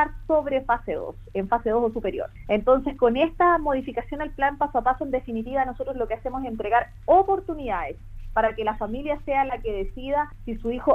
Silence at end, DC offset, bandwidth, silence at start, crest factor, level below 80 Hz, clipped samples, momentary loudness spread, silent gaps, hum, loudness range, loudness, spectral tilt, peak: 0 s; under 0.1%; 5.6 kHz; 0 s; 18 dB; -40 dBFS; under 0.1%; 11 LU; none; none; 3 LU; -25 LUFS; -8 dB/octave; -6 dBFS